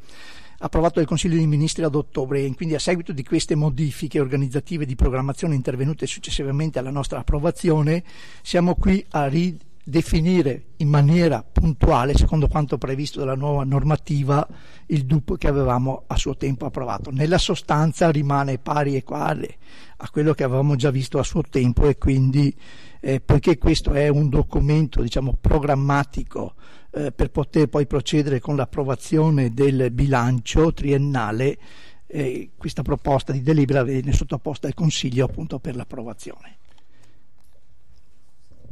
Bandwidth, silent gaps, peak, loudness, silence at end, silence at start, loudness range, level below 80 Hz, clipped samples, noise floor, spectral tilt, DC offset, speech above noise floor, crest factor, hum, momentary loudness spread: 12 kHz; none; -4 dBFS; -21 LUFS; 2.4 s; 0.2 s; 4 LU; -30 dBFS; under 0.1%; -60 dBFS; -6.5 dB/octave; 2%; 40 dB; 16 dB; none; 9 LU